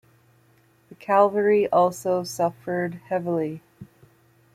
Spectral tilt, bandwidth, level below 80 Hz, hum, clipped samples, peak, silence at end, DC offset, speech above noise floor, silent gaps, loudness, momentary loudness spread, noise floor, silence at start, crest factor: -6 dB/octave; 15.5 kHz; -68 dBFS; none; under 0.1%; -6 dBFS; 0.7 s; under 0.1%; 37 dB; none; -23 LUFS; 10 LU; -60 dBFS; 0.9 s; 18 dB